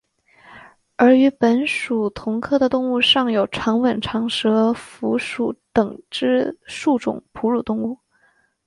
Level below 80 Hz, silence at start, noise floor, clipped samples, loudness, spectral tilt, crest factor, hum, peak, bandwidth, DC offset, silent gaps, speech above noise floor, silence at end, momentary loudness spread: -54 dBFS; 0.5 s; -61 dBFS; under 0.1%; -19 LUFS; -5 dB/octave; 16 dB; none; -4 dBFS; 11.5 kHz; under 0.1%; none; 42 dB; 0.7 s; 10 LU